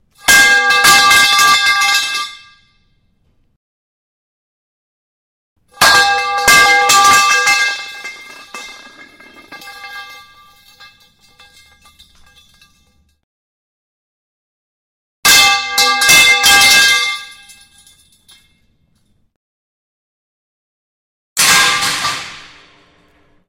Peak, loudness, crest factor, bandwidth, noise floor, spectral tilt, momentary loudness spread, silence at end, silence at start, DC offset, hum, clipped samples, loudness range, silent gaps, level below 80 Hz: 0 dBFS; -8 LUFS; 16 dB; 16.5 kHz; -58 dBFS; 1 dB/octave; 23 LU; 1.1 s; 0.25 s; under 0.1%; none; under 0.1%; 14 LU; 3.56-5.56 s, 13.24-15.23 s, 19.36-21.36 s; -48 dBFS